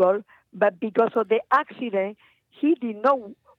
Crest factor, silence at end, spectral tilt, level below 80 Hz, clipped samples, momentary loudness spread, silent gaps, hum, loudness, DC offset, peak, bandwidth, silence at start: 18 dB; 0.25 s; -7.5 dB/octave; -80 dBFS; under 0.1%; 6 LU; none; none; -24 LUFS; under 0.1%; -6 dBFS; 6 kHz; 0 s